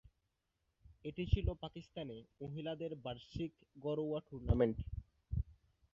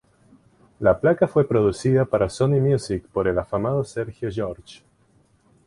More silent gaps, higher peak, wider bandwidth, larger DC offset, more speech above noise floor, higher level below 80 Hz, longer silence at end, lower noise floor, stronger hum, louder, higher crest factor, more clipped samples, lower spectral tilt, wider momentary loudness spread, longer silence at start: neither; second, -18 dBFS vs -4 dBFS; second, 7 kHz vs 11.5 kHz; neither; first, 45 dB vs 39 dB; about the same, -48 dBFS vs -46 dBFS; second, 0.4 s vs 0.95 s; first, -85 dBFS vs -60 dBFS; neither; second, -42 LUFS vs -22 LUFS; first, 24 dB vs 18 dB; neither; about the same, -7.5 dB/octave vs -7.5 dB/octave; first, 14 LU vs 10 LU; about the same, 0.9 s vs 0.8 s